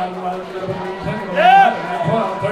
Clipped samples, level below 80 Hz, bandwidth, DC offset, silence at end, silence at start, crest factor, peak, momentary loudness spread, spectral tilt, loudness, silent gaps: under 0.1%; -50 dBFS; 11 kHz; under 0.1%; 0 s; 0 s; 16 dB; 0 dBFS; 15 LU; -6 dB/octave; -16 LUFS; none